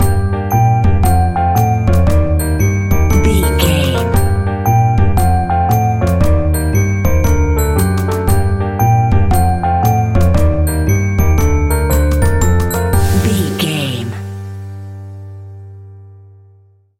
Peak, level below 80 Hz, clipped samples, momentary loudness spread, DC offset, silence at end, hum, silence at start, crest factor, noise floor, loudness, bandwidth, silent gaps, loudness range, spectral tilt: 0 dBFS; -20 dBFS; under 0.1%; 10 LU; under 0.1%; 0.85 s; none; 0 s; 12 dB; -48 dBFS; -13 LUFS; 16.5 kHz; none; 4 LU; -6 dB/octave